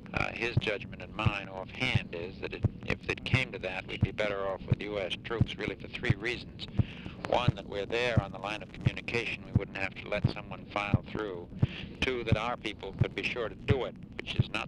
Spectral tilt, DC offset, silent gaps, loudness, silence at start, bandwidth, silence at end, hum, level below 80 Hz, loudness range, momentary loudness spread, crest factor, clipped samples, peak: -6.5 dB/octave; under 0.1%; none; -33 LUFS; 0 s; 10 kHz; 0 s; none; -48 dBFS; 1 LU; 8 LU; 20 dB; under 0.1%; -12 dBFS